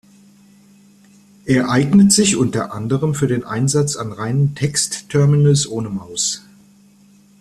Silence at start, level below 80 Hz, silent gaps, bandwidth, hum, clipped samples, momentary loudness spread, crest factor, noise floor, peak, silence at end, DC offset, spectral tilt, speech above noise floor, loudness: 1.45 s; -52 dBFS; none; 13.5 kHz; none; under 0.1%; 11 LU; 16 dB; -49 dBFS; 0 dBFS; 1 s; under 0.1%; -5 dB/octave; 33 dB; -16 LUFS